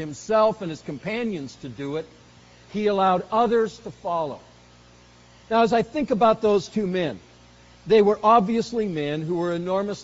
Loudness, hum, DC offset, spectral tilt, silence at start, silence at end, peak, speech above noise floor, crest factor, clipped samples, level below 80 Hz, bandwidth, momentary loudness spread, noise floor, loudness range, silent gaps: -23 LUFS; 60 Hz at -55 dBFS; under 0.1%; -5 dB/octave; 0 s; 0 s; -6 dBFS; 29 dB; 18 dB; under 0.1%; -56 dBFS; 8 kHz; 15 LU; -51 dBFS; 4 LU; none